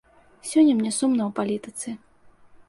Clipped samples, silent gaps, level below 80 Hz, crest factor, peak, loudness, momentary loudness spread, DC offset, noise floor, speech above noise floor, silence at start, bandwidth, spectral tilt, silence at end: under 0.1%; none; -64 dBFS; 16 dB; -8 dBFS; -23 LUFS; 17 LU; under 0.1%; -52 dBFS; 30 dB; 0.45 s; 11.5 kHz; -4.5 dB/octave; 0.75 s